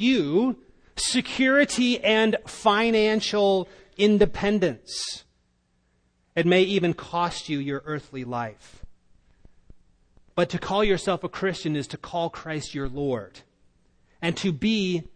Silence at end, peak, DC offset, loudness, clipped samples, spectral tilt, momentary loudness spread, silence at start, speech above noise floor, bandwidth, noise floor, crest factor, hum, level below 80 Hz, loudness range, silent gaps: 0.05 s; -6 dBFS; under 0.1%; -24 LUFS; under 0.1%; -4.5 dB/octave; 12 LU; 0 s; 44 dB; 10.5 kHz; -68 dBFS; 18 dB; none; -48 dBFS; 9 LU; none